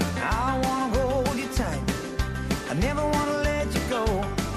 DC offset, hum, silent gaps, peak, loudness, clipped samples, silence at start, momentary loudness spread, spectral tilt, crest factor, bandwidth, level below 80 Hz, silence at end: under 0.1%; none; none; -12 dBFS; -26 LUFS; under 0.1%; 0 s; 5 LU; -5.5 dB/octave; 14 dB; 13.5 kHz; -34 dBFS; 0 s